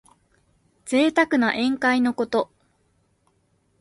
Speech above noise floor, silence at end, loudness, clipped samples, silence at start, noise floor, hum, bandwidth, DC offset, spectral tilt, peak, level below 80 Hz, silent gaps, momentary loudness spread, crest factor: 46 dB; 1.35 s; -21 LUFS; under 0.1%; 0.85 s; -66 dBFS; none; 11.5 kHz; under 0.1%; -4 dB/octave; -6 dBFS; -64 dBFS; none; 8 LU; 18 dB